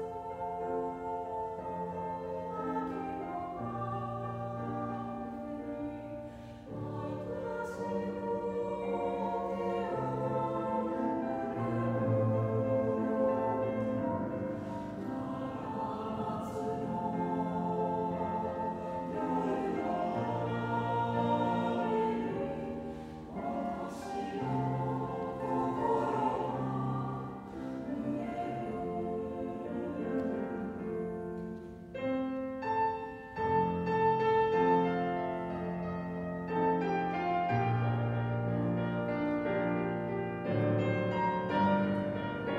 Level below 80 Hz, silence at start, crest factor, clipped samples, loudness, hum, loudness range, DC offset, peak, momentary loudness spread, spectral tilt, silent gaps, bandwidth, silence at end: -60 dBFS; 0 s; 16 dB; under 0.1%; -34 LUFS; none; 7 LU; under 0.1%; -18 dBFS; 9 LU; -8.5 dB/octave; none; 10.5 kHz; 0 s